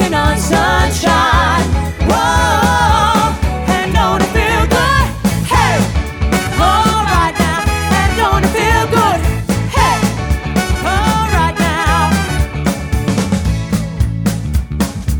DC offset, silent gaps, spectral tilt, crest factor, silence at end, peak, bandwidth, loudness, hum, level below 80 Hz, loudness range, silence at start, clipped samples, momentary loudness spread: under 0.1%; none; -5 dB/octave; 12 dB; 0 s; 0 dBFS; 20 kHz; -13 LUFS; none; -20 dBFS; 2 LU; 0 s; under 0.1%; 6 LU